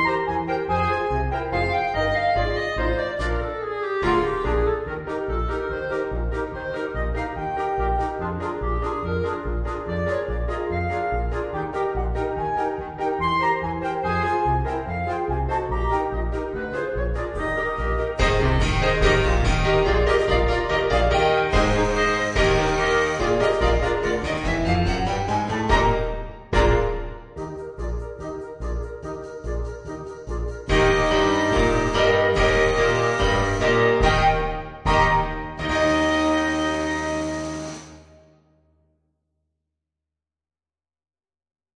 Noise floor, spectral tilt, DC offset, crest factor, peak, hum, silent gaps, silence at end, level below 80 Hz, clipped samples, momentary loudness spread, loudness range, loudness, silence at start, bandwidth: under -90 dBFS; -5.5 dB/octave; under 0.1%; 20 dB; -4 dBFS; none; none; 3.75 s; -30 dBFS; under 0.1%; 12 LU; 7 LU; -23 LUFS; 0 s; 10 kHz